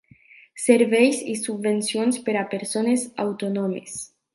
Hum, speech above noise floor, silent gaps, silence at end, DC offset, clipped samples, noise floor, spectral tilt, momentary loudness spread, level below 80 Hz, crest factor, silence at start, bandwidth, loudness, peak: none; 30 dB; none; 0.3 s; under 0.1%; under 0.1%; -52 dBFS; -4 dB/octave; 11 LU; -72 dBFS; 20 dB; 0.55 s; 11.5 kHz; -22 LUFS; -2 dBFS